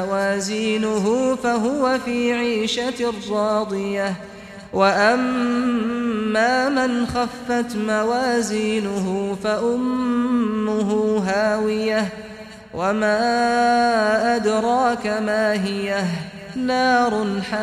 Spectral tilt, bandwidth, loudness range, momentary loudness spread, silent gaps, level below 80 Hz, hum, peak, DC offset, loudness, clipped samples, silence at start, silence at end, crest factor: -5 dB/octave; 14 kHz; 2 LU; 7 LU; none; -52 dBFS; none; -4 dBFS; under 0.1%; -20 LUFS; under 0.1%; 0 s; 0 s; 16 dB